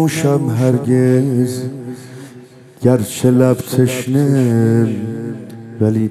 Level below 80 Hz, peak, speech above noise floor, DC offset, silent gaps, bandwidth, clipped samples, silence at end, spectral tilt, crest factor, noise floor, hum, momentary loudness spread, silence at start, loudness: -56 dBFS; 0 dBFS; 25 dB; under 0.1%; none; 14.5 kHz; under 0.1%; 0 s; -7 dB/octave; 14 dB; -39 dBFS; none; 17 LU; 0 s; -15 LUFS